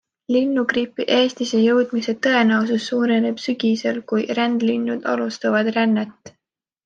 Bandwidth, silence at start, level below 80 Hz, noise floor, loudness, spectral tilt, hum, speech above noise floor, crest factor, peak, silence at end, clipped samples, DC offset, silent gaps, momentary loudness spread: 7.6 kHz; 0.3 s; -68 dBFS; -80 dBFS; -20 LUFS; -5 dB/octave; none; 61 dB; 16 dB; -4 dBFS; 0.55 s; under 0.1%; under 0.1%; none; 6 LU